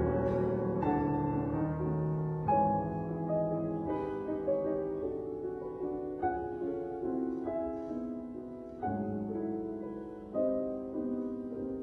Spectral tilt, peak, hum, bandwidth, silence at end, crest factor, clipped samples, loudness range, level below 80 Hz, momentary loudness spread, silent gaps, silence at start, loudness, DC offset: -11 dB/octave; -18 dBFS; none; 4.5 kHz; 0 s; 16 dB; under 0.1%; 5 LU; -56 dBFS; 8 LU; none; 0 s; -35 LUFS; under 0.1%